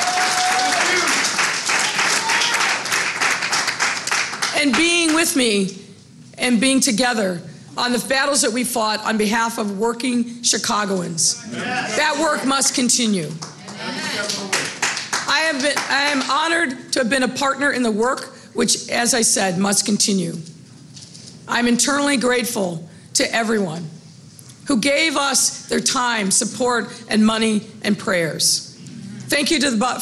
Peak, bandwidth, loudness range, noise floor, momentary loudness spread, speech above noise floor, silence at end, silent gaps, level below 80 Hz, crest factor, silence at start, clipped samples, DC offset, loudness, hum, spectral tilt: -4 dBFS; 13.5 kHz; 3 LU; -43 dBFS; 9 LU; 24 dB; 0 s; none; -56 dBFS; 14 dB; 0 s; under 0.1%; under 0.1%; -18 LUFS; none; -2 dB/octave